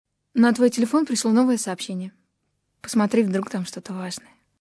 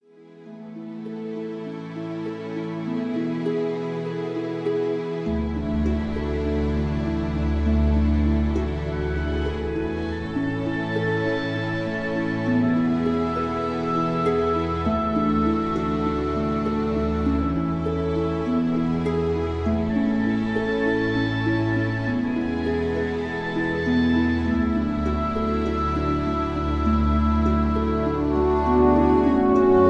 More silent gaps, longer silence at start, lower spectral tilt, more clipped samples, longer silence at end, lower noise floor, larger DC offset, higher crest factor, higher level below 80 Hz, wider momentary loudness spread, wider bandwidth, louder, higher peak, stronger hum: neither; first, 0.35 s vs 0.2 s; second, -5 dB/octave vs -8.5 dB/octave; neither; first, 0.4 s vs 0 s; first, -74 dBFS vs -46 dBFS; neither; about the same, 16 dB vs 16 dB; second, -72 dBFS vs -32 dBFS; first, 14 LU vs 7 LU; first, 11 kHz vs 7.8 kHz; about the same, -22 LUFS vs -24 LUFS; about the same, -6 dBFS vs -6 dBFS; neither